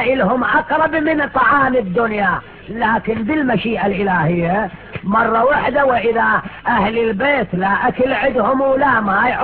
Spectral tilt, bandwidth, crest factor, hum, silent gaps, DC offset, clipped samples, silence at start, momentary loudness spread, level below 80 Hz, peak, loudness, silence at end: -9.5 dB/octave; 4.6 kHz; 14 dB; none; none; under 0.1%; under 0.1%; 0 s; 5 LU; -42 dBFS; -2 dBFS; -16 LUFS; 0 s